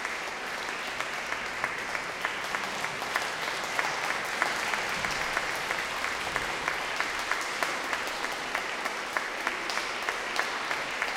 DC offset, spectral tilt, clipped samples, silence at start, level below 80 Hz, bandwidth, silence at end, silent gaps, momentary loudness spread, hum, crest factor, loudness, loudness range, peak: under 0.1%; -1 dB/octave; under 0.1%; 0 s; -60 dBFS; 17 kHz; 0 s; none; 3 LU; none; 24 dB; -30 LUFS; 2 LU; -8 dBFS